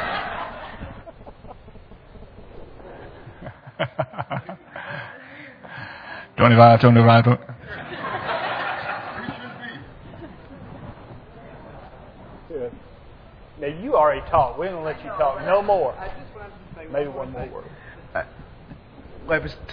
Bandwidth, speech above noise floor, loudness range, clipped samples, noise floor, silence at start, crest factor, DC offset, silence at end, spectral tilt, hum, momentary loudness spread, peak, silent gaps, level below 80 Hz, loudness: 5.2 kHz; 27 dB; 22 LU; under 0.1%; -45 dBFS; 0 s; 24 dB; under 0.1%; 0 s; -9.5 dB/octave; none; 26 LU; 0 dBFS; none; -48 dBFS; -21 LUFS